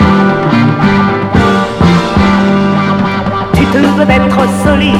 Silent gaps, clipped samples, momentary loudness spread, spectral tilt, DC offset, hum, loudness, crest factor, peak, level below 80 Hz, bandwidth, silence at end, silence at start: none; 0.8%; 3 LU; -7 dB/octave; under 0.1%; none; -9 LUFS; 8 dB; 0 dBFS; -26 dBFS; 13 kHz; 0 s; 0 s